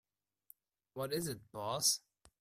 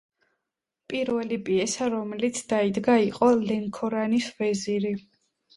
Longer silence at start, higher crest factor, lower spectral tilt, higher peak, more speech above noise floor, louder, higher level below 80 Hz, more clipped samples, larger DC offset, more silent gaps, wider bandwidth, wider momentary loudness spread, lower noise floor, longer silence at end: about the same, 0.95 s vs 0.9 s; about the same, 22 dB vs 18 dB; second, -2.5 dB/octave vs -5 dB/octave; second, -18 dBFS vs -8 dBFS; second, 29 dB vs 60 dB; second, -37 LUFS vs -26 LUFS; second, -74 dBFS vs -64 dBFS; neither; neither; neither; first, 16 kHz vs 11.5 kHz; first, 12 LU vs 7 LU; second, -67 dBFS vs -85 dBFS; about the same, 0.45 s vs 0.55 s